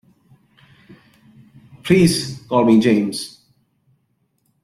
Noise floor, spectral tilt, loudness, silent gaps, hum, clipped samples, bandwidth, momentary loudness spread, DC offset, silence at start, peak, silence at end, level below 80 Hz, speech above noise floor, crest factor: -67 dBFS; -5.5 dB/octave; -16 LUFS; none; none; under 0.1%; 13.5 kHz; 17 LU; under 0.1%; 1.85 s; -2 dBFS; 1.35 s; -52 dBFS; 51 dB; 18 dB